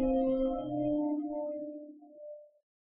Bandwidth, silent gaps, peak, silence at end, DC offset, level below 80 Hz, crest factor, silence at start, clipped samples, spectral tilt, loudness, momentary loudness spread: 3.4 kHz; none; -20 dBFS; 0.45 s; under 0.1%; -52 dBFS; 14 dB; 0 s; under 0.1%; -8.5 dB/octave; -33 LUFS; 20 LU